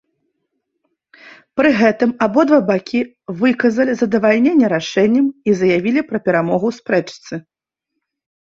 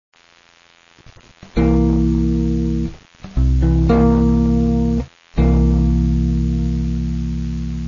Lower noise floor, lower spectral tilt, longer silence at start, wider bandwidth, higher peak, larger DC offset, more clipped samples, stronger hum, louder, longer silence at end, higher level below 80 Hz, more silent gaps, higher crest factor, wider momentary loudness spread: first, -78 dBFS vs -51 dBFS; second, -6.5 dB/octave vs -9.5 dB/octave; second, 1.25 s vs 1.55 s; about the same, 7.6 kHz vs 7.2 kHz; about the same, -2 dBFS vs -4 dBFS; neither; neither; neither; about the same, -16 LUFS vs -17 LUFS; first, 1.05 s vs 0 s; second, -58 dBFS vs -20 dBFS; neither; about the same, 16 dB vs 12 dB; about the same, 9 LU vs 10 LU